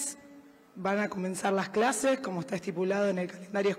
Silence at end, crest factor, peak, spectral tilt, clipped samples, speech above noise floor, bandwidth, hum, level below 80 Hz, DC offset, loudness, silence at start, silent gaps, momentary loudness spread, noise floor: 0 s; 16 dB; -14 dBFS; -4.5 dB/octave; under 0.1%; 24 dB; 16 kHz; none; -74 dBFS; under 0.1%; -30 LUFS; 0 s; none; 8 LU; -54 dBFS